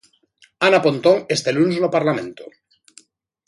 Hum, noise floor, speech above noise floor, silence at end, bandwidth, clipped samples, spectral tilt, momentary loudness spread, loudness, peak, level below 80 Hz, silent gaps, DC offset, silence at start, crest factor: none; -57 dBFS; 39 dB; 1 s; 11.5 kHz; under 0.1%; -5 dB/octave; 7 LU; -18 LUFS; 0 dBFS; -66 dBFS; none; under 0.1%; 0.6 s; 20 dB